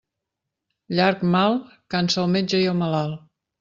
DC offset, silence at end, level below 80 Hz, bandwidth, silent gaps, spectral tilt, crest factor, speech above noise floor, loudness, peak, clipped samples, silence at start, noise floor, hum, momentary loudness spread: under 0.1%; 0.4 s; -60 dBFS; 7.6 kHz; none; -6 dB/octave; 18 dB; 62 dB; -22 LUFS; -4 dBFS; under 0.1%; 0.9 s; -83 dBFS; none; 9 LU